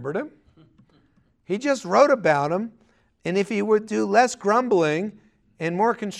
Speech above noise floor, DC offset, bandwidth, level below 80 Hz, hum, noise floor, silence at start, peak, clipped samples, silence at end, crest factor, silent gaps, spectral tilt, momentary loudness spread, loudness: 41 dB; under 0.1%; 12 kHz; -68 dBFS; none; -62 dBFS; 0 s; -4 dBFS; under 0.1%; 0 s; 20 dB; none; -5.5 dB/octave; 13 LU; -22 LUFS